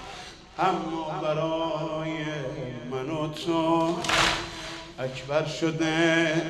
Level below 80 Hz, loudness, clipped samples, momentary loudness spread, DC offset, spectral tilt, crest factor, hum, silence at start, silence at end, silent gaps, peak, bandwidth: -52 dBFS; -27 LUFS; under 0.1%; 13 LU; under 0.1%; -4.5 dB/octave; 18 dB; none; 0 s; 0 s; none; -10 dBFS; 14 kHz